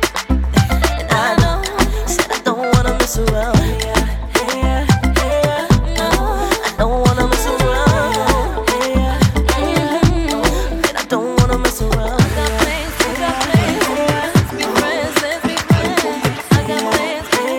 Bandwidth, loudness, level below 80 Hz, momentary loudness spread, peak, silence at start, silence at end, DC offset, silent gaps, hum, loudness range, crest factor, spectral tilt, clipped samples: over 20 kHz; -16 LUFS; -22 dBFS; 3 LU; 0 dBFS; 0 s; 0 s; under 0.1%; none; none; 1 LU; 14 dB; -5 dB/octave; under 0.1%